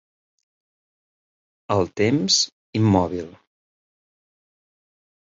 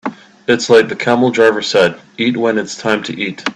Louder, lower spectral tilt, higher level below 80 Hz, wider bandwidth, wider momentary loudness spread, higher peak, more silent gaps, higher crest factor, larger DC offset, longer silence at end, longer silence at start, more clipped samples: second, -20 LUFS vs -14 LUFS; about the same, -4.5 dB/octave vs -4.5 dB/octave; first, -50 dBFS vs -56 dBFS; second, 8 kHz vs 10.5 kHz; about the same, 11 LU vs 9 LU; second, -4 dBFS vs 0 dBFS; first, 2.52-2.73 s vs none; first, 22 dB vs 14 dB; neither; first, 2 s vs 0.05 s; first, 1.7 s vs 0.05 s; neither